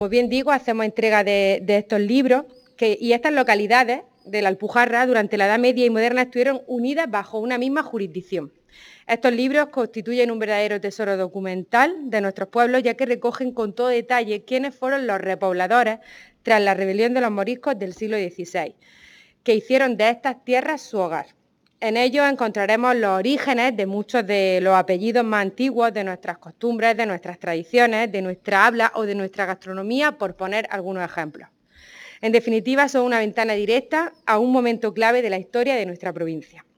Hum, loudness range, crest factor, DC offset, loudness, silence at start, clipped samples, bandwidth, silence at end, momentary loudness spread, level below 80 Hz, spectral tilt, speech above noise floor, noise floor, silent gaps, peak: none; 4 LU; 20 dB; under 0.1%; -21 LUFS; 0 s; under 0.1%; 18.5 kHz; 0.2 s; 10 LU; -66 dBFS; -5 dB/octave; 28 dB; -49 dBFS; none; 0 dBFS